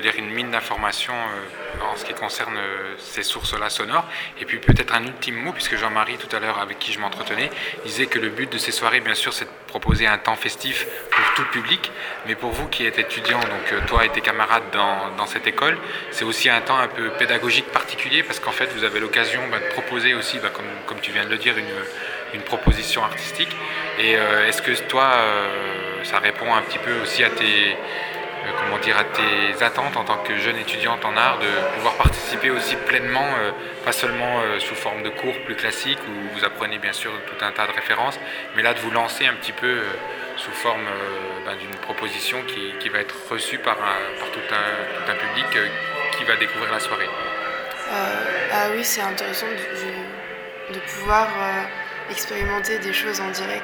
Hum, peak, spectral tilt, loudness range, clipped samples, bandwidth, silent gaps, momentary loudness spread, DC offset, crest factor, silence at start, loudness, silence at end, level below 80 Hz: none; 0 dBFS; -3 dB/octave; 5 LU; under 0.1%; over 20 kHz; none; 9 LU; under 0.1%; 22 dB; 0 s; -21 LUFS; 0 s; -38 dBFS